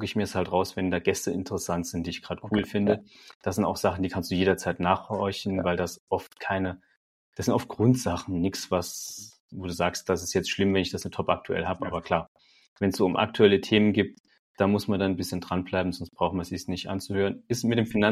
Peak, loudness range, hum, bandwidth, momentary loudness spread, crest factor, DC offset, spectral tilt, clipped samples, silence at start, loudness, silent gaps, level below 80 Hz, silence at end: -4 dBFS; 4 LU; none; 15.5 kHz; 9 LU; 22 dB; under 0.1%; -5.5 dB/octave; under 0.1%; 0 s; -27 LUFS; 3.35-3.40 s, 6.00-6.07 s, 6.97-7.32 s, 9.40-9.49 s, 12.28-12.35 s, 12.68-12.76 s, 14.20-14.24 s, 14.39-14.54 s; -54 dBFS; 0 s